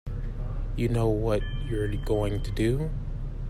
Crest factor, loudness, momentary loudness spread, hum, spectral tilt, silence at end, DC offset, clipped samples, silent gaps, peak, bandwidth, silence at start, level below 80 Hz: 14 dB; -29 LUFS; 10 LU; none; -7.5 dB/octave; 0 s; under 0.1%; under 0.1%; none; -12 dBFS; 13.5 kHz; 0.05 s; -32 dBFS